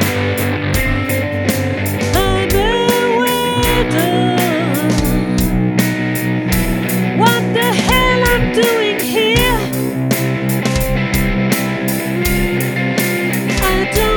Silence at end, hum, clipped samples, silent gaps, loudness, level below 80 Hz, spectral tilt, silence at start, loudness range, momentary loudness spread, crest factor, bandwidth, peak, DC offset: 0 s; none; under 0.1%; none; -15 LUFS; -26 dBFS; -5 dB/octave; 0 s; 3 LU; 4 LU; 14 dB; 19.5 kHz; 0 dBFS; under 0.1%